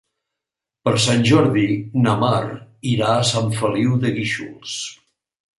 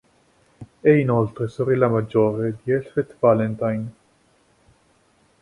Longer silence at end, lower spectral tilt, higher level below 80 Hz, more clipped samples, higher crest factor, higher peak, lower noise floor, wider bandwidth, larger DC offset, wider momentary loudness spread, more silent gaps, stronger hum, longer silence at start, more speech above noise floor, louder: second, 0.65 s vs 1.5 s; second, -5 dB/octave vs -9.5 dB/octave; about the same, -54 dBFS vs -56 dBFS; neither; about the same, 18 dB vs 18 dB; about the same, -2 dBFS vs -4 dBFS; first, -85 dBFS vs -60 dBFS; about the same, 11.5 kHz vs 11 kHz; neither; first, 13 LU vs 8 LU; neither; neither; first, 0.85 s vs 0.6 s; first, 67 dB vs 40 dB; about the same, -19 LUFS vs -21 LUFS